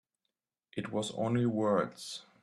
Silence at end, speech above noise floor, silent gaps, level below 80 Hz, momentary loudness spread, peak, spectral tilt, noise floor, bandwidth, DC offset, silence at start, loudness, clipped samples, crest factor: 0.2 s; 55 dB; none; -74 dBFS; 13 LU; -16 dBFS; -6 dB/octave; -87 dBFS; 13 kHz; under 0.1%; 0.75 s; -33 LUFS; under 0.1%; 18 dB